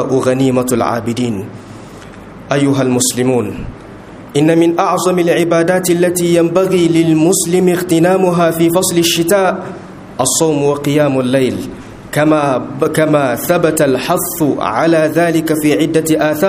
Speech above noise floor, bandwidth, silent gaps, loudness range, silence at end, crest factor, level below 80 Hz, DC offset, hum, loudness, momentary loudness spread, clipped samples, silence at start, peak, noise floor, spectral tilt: 20 dB; 15.5 kHz; none; 4 LU; 0 s; 12 dB; -46 dBFS; under 0.1%; none; -12 LUFS; 16 LU; under 0.1%; 0 s; 0 dBFS; -32 dBFS; -5 dB/octave